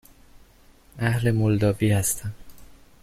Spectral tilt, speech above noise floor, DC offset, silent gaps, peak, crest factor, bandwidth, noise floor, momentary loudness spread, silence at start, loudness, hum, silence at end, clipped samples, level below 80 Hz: -5.5 dB/octave; 32 dB; under 0.1%; none; -8 dBFS; 16 dB; 14.5 kHz; -54 dBFS; 8 LU; 0.95 s; -23 LUFS; none; 0.3 s; under 0.1%; -48 dBFS